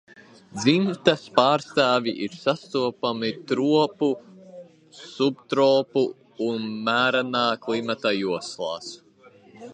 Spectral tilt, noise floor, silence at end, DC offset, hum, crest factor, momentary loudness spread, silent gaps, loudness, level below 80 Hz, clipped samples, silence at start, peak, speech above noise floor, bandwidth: -5 dB/octave; -53 dBFS; 0 s; under 0.1%; none; 24 dB; 10 LU; none; -23 LUFS; -70 dBFS; under 0.1%; 0.55 s; 0 dBFS; 30 dB; 10 kHz